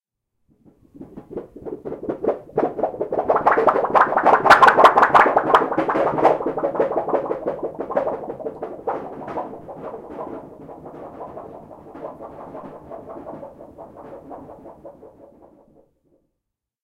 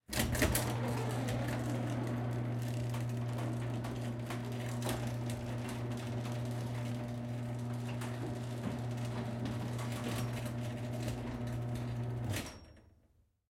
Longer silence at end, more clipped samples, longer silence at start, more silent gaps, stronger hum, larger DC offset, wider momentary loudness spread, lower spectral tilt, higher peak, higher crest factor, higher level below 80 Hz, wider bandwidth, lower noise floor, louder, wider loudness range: first, 1.75 s vs 0.7 s; neither; first, 0.95 s vs 0.1 s; neither; neither; neither; first, 26 LU vs 4 LU; about the same, -5 dB/octave vs -5.5 dB/octave; first, 0 dBFS vs -16 dBFS; about the same, 22 dB vs 22 dB; about the same, -56 dBFS vs -54 dBFS; about the same, 16 kHz vs 16.5 kHz; first, -81 dBFS vs -71 dBFS; first, -18 LUFS vs -38 LUFS; first, 23 LU vs 3 LU